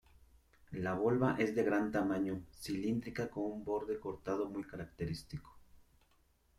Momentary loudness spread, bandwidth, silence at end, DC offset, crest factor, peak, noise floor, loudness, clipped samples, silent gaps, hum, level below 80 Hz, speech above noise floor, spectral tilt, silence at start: 12 LU; 15 kHz; 0.8 s; under 0.1%; 18 dB; -20 dBFS; -72 dBFS; -37 LUFS; under 0.1%; none; none; -62 dBFS; 35 dB; -7 dB/octave; 0.7 s